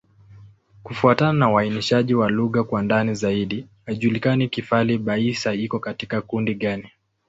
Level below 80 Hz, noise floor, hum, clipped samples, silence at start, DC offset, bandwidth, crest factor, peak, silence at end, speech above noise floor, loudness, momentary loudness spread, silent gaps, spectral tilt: -54 dBFS; -48 dBFS; none; under 0.1%; 0.3 s; under 0.1%; 8 kHz; 20 dB; -2 dBFS; 0.4 s; 27 dB; -21 LUFS; 10 LU; none; -6.5 dB/octave